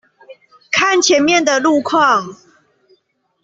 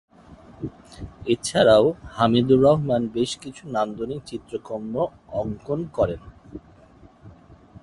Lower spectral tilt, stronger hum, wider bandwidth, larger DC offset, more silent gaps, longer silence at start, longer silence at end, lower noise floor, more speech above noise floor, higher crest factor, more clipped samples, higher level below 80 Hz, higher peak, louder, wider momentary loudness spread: second, -2 dB/octave vs -6 dB/octave; neither; second, 8 kHz vs 11.5 kHz; neither; neither; about the same, 0.3 s vs 0.3 s; first, 1.1 s vs 0.05 s; first, -61 dBFS vs -51 dBFS; first, 47 dB vs 29 dB; second, 14 dB vs 20 dB; neither; second, -60 dBFS vs -50 dBFS; about the same, -2 dBFS vs -4 dBFS; first, -13 LUFS vs -22 LUFS; second, 6 LU vs 20 LU